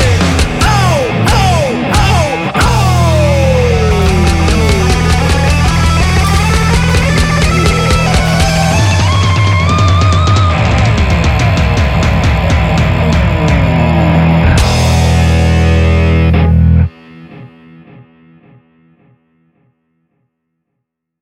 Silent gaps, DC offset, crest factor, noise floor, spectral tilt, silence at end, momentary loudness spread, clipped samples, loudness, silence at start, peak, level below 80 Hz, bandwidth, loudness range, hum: none; under 0.1%; 10 dB; -73 dBFS; -5.5 dB/octave; 3.2 s; 2 LU; under 0.1%; -10 LUFS; 0 s; 0 dBFS; -16 dBFS; 14.5 kHz; 2 LU; none